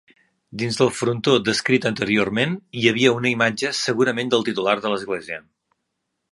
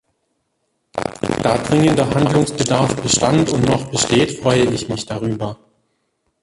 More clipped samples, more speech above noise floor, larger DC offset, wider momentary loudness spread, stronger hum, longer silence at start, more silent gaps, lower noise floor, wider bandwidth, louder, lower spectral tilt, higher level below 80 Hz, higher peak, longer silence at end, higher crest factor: neither; about the same, 56 dB vs 53 dB; neither; about the same, 10 LU vs 10 LU; neither; second, 0.5 s vs 0.95 s; neither; first, -77 dBFS vs -69 dBFS; about the same, 11.5 kHz vs 11.5 kHz; second, -20 LUFS vs -17 LUFS; about the same, -4.5 dB/octave vs -5 dB/octave; second, -60 dBFS vs -44 dBFS; about the same, 0 dBFS vs -2 dBFS; about the same, 0.95 s vs 0.9 s; first, 22 dB vs 16 dB